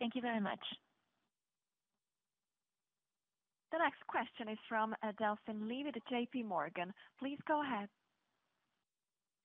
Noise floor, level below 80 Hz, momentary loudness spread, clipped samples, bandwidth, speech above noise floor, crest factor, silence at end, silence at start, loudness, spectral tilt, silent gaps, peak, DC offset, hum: under -90 dBFS; -88 dBFS; 9 LU; under 0.1%; 4 kHz; over 49 dB; 22 dB; 1.55 s; 0 s; -41 LUFS; -2.5 dB/octave; none; -22 dBFS; under 0.1%; none